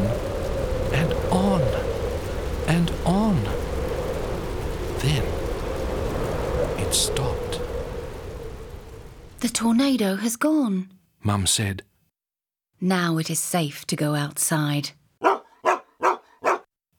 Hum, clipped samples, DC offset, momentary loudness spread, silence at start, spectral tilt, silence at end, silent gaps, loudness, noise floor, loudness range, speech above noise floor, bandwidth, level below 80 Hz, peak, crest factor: none; under 0.1%; under 0.1%; 11 LU; 0 s; -4.5 dB/octave; 0.35 s; none; -24 LUFS; under -90 dBFS; 3 LU; over 68 dB; over 20 kHz; -34 dBFS; -2 dBFS; 22 dB